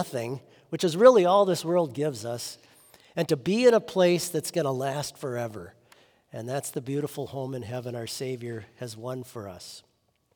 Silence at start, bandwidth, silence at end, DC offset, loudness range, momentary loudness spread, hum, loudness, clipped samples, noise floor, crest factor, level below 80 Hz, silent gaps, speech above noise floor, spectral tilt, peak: 0 s; over 20 kHz; 0.55 s; under 0.1%; 11 LU; 19 LU; none; -26 LUFS; under 0.1%; -60 dBFS; 24 dB; -72 dBFS; none; 34 dB; -5 dB/octave; -4 dBFS